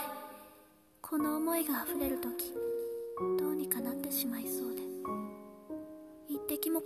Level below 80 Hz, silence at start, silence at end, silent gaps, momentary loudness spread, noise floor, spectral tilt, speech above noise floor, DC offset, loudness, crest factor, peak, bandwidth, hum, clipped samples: -66 dBFS; 0 s; 0 s; none; 17 LU; -62 dBFS; -4 dB/octave; 27 dB; under 0.1%; -36 LUFS; 22 dB; -14 dBFS; 14.5 kHz; none; under 0.1%